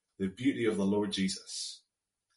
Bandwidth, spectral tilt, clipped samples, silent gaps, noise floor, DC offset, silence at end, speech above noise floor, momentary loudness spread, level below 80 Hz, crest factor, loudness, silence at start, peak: 11.5 kHz; -5 dB/octave; under 0.1%; none; -84 dBFS; under 0.1%; 0.6 s; 51 dB; 9 LU; -70 dBFS; 16 dB; -33 LUFS; 0.2 s; -18 dBFS